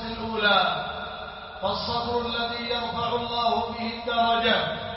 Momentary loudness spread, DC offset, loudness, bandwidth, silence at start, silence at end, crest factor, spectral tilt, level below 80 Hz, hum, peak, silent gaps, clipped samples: 11 LU; under 0.1%; -25 LUFS; 6 kHz; 0 s; 0 s; 18 dB; -7.5 dB/octave; -48 dBFS; none; -8 dBFS; none; under 0.1%